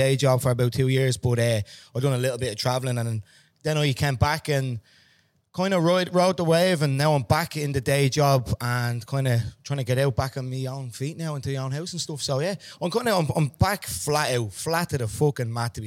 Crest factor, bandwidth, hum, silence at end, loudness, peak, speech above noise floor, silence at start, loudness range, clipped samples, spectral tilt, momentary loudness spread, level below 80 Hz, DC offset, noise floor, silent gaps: 18 dB; 16.5 kHz; none; 0 s; -24 LUFS; -6 dBFS; 39 dB; 0 s; 5 LU; under 0.1%; -5.5 dB/octave; 10 LU; -48 dBFS; under 0.1%; -63 dBFS; none